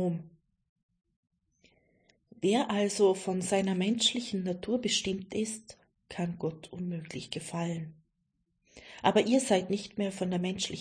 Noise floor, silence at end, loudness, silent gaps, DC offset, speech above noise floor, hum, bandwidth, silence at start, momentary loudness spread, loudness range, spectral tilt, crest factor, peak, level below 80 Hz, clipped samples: -78 dBFS; 0 s; -31 LUFS; 0.69-0.76 s, 0.83-0.89 s, 1.16-1.23 s; under 0.1%; 48 dB; none; 10.5 kHz; 0 s; 13 LU; 8 LU; -4.5 dB/octave; 22 dB; -10 dBFS; -66 dBFS; under 0.1%